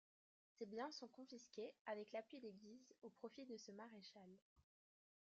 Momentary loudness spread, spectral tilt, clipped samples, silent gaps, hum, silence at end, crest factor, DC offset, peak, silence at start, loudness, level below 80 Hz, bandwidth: 12 LU; -3 dB/octave; under 0.1%; 1.81-1.85 s, 4.42-4.56 s; none; 0.7 s; 20 dB; under 0.1%; -38 dBFS; 0.6 s; -56 LUFS; under -90 dBFS; 7.4 kHz